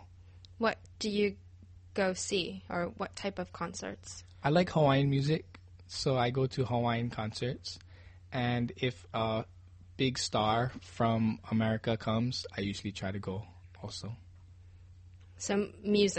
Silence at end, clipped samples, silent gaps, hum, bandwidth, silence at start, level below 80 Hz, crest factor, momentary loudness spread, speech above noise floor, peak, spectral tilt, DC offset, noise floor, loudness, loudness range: 0 s; under 0.1%; none; none; 8.4 kHz; 0 s; -58 dBFS; 20 dB; 14 LU; 22 dB; -14 dBFS; -5.5 dB/octave; under 0.1%; -54 dBFS; -33 LUFS; 6 LU